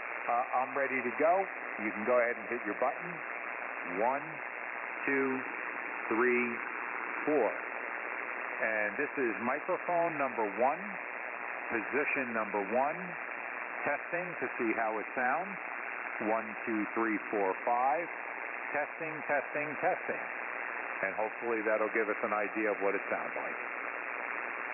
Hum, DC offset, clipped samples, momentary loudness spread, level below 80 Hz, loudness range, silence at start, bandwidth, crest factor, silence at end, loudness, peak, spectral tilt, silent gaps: none; under 0.1%; under 0.1%; 8 LU; -82 dBFS; 2 LU; 0 s; 3 kHz; 16 dB; 0 s; -34 LUFS; -18 dBFS; 1.5 dB/octave; none